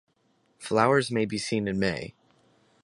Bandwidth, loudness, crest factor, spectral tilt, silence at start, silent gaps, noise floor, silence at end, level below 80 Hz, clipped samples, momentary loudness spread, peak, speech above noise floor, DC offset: 11.5 kHz; -26 LUFS; 22 dB; -5 dB/octave; 0.6 s; none; -69 dBFS; 0.75 s; -58 dBFS; under 0.1%; 16 LU; -6 dBFS; 43 dB; under 0.1%